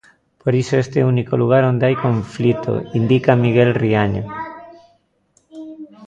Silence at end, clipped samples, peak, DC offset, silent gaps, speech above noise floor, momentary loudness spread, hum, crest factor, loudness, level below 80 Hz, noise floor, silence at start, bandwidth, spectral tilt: 0 s; under 0.1%; 0 dBFS; under 0.1%; none; 45 dB; 16 LU; none; 18 dB; -17 LUFS; -48 dBFS; -61 dBFS; 0.45 s; 7.8 kHz; -8 dB/octave